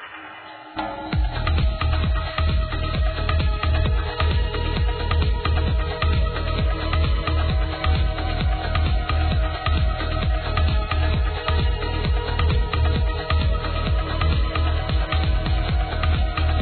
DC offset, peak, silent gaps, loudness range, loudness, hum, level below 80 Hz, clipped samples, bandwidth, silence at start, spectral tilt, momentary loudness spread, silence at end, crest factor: under 0.1%; -6 dBFS; none; 1 LU; -23 LUFS; none; -22 dBFS; under 0.1%; 4.6 kHz; 0 s; -9.5 dB/octave; 2 LU; 0 s; 14 dB